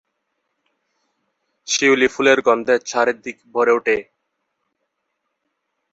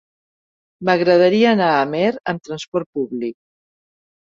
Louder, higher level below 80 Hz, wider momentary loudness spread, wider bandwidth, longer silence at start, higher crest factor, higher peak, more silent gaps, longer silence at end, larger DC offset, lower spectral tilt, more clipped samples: about the same, -17 LUFS vs -18 LUFS; about the same, -64 dBFS vs -64 dBFS; second, 10 LU vs 13 LU; about the same, 8 kHz vs 7.6 kHz; first, 1.65 s vs 0.8 s; about the same, 20 dB vs 16 dB; about the same, -2 dBFS vs -2 dBFS; second, none vs 2.68-2.72 s, 2.86-2.93 s; first, 1.9 s vs 0.9 s; neither; second, -2.5 dB/octave vs -6 dB/octave; neither